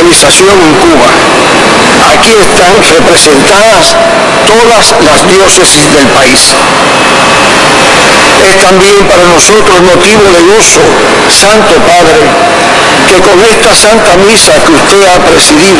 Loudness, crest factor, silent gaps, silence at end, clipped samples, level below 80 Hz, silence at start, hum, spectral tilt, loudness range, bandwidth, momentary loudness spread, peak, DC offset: -1 LUFS; 2 dB; none; 0 s; 20%; -26 dBFS; 0 s; none; -2.5 dB/octave; 1 LU; 12 kHz; 2 LU; 0 dBFS; 2%